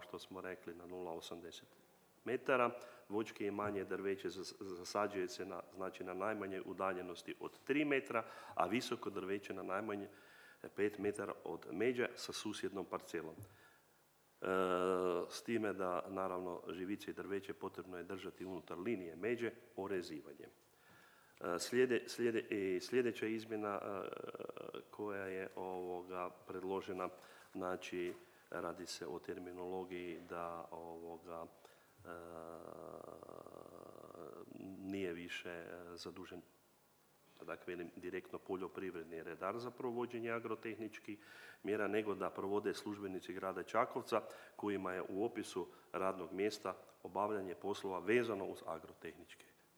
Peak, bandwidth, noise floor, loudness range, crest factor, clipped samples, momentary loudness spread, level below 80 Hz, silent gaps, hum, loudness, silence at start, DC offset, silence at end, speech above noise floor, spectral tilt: -18 dBFS; over 20 kHz; -72 dBFS; 9 LU; 26 dB; under 0.1%; 15 LU; -84 dBFS; none; none; -43 LUFS; 0 s; under 0.1%; 0.25 s; 30 dB; -5 dB/octave